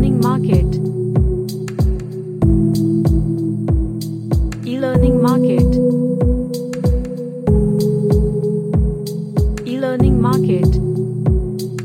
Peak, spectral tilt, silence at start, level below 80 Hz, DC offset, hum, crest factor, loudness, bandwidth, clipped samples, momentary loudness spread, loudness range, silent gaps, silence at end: 0 dBFS; -8.5 dB/octave; 0 s; -22 dBFS; under 0.1%; none; 14 dB; -17 LUFS; 16.5 kHz; under 0.1%; 8 LU; 2 LU; none; 0 s